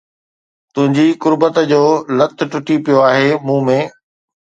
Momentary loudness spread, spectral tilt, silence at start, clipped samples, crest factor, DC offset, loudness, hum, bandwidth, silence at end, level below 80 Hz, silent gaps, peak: 6 LU; -6.5 dB/octave; 0.75 s; under 0.1%; 14 dB; under 0.1%; -13 LUFS; none; 7.8 kHz; 0.6 s; -64 dBFS; none; 0 dBFS